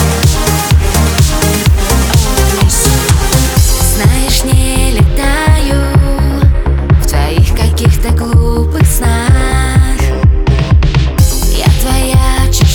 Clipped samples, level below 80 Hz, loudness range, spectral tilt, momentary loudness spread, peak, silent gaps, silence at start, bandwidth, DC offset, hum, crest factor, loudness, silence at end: 0.1%; -12 dBFS; 1 LU; -4.5 dB/octave; 2 LU; 0 dBFS; none; 0 s; over 20 kHz; under 0.1%; none; 8 dB; -10 LUFS; 0 s